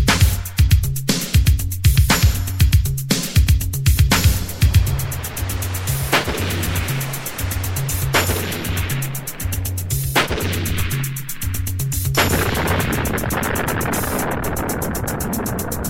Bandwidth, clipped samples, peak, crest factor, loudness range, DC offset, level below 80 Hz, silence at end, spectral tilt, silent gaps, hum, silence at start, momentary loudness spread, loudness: 16.5 kHz; under 0.1%; -2 dBFS; 16 dB; 5 LU; 0.9%; -24 dBFS; 0 s; -4.5 dB/octave; none; none; 0 s; 7 LU; -19 LUFS